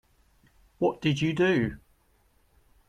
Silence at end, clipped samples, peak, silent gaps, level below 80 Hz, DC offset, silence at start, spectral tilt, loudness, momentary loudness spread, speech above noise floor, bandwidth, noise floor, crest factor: 1.1 s; under 0.1%; -12 dBFS; none; -56 dBFS; under 0.1%; 0.8 s; -6.5 dB/octave; -27 LUFS; 8 LU; 40 dB; 11 kHz; -66 dBFS; 18 dB